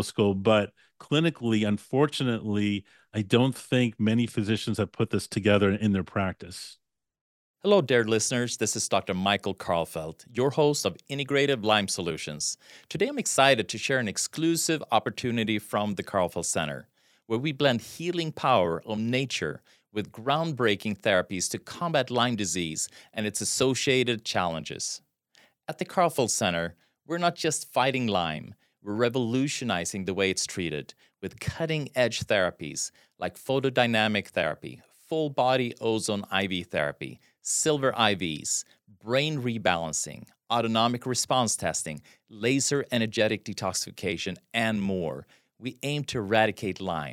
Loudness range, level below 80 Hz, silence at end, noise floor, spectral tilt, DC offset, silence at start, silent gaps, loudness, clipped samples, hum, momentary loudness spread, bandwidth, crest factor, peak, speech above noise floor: 3 LU; -66 dBFS; 0 s; -63 dBFS; -4 dB/octave; under 0.1%; 0 s; 7.21-7.54 s; -27 LUFS; under 0.1%; none; 11 LU; 16.5 kHz; 24 dB; -4 dBFS; 36 dB